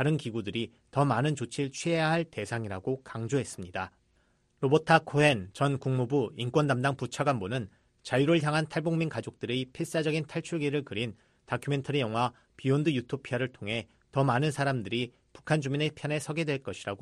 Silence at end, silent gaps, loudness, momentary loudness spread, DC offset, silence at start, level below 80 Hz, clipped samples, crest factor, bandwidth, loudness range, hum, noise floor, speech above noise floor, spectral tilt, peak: 0.05 s; none; -30 LUFS; 10 LU; under 0.1%; 0 s; -64 dBFS; under 0.1%; 22 dB; 12.5 kHz; 4 LU; none; -69 dBFS; 40 dB; -6 dB/octave; -8 dBFS